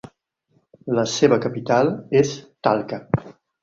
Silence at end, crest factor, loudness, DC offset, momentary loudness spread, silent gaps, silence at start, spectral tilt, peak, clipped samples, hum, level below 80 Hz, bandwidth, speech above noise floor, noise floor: 0.3 s; 20 dB; -21 LUFS; under 0.1%; 8 LU; none; 0.85 s; -5.5 dB/octave; -2 dBFS; under 0.1%; none; -54 dBFS; 7.8 kHz; 46 dB; -66 dBFS